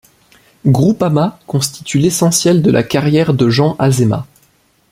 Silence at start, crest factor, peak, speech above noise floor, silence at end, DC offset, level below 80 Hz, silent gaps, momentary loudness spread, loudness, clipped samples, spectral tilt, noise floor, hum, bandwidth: 0.65 s; 12 dB; 0 dBFS; 42 dB; 0.7 s; under 0.1%; -48 dBFS; none; 7 LU; -13 LUFS; under 0.1%; -5.5 dB/octave; -54 dBFS; none; 16 kHz